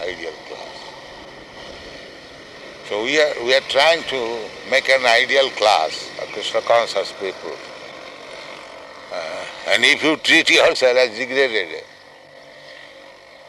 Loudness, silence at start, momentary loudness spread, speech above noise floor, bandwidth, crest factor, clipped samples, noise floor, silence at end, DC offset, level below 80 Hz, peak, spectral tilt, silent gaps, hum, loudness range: -17 LUFS; 0 s; 24 LU; 26 dB; 12 kHz; 18 dB; under 0.1%; -44 dBFS; 0.35 s; under 0.1%; -58 dBFS; -2 dBFS; -1.5 dB/octave; none; none; 8 LU